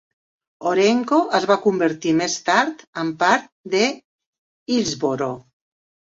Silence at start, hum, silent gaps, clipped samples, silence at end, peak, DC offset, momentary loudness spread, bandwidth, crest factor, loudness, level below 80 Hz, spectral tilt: 0.6 s; none; 2.87-2.93 s, 3.52-3.64 s, 4.05-4.19 s, 4.26-4.66 s; under 0.1%; 0.7 s; -2 dBFS; under 0.1%; 10 LU; 8 kHz; 18 dB; -20 LUFS; -64 dBFS; -4 dB/octave